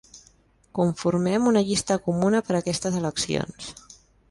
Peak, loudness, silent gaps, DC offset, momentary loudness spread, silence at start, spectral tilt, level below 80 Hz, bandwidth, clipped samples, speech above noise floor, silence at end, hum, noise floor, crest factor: -8 dBFS; -24 LUFS; none; under 0.1%; 12 LU; 0.15 s; -5 dB/octave; -54 dBFS; 11.5 kHz; under 0.1%; 36 dB; 0.35 s; none; -59 dBFS; 16 dB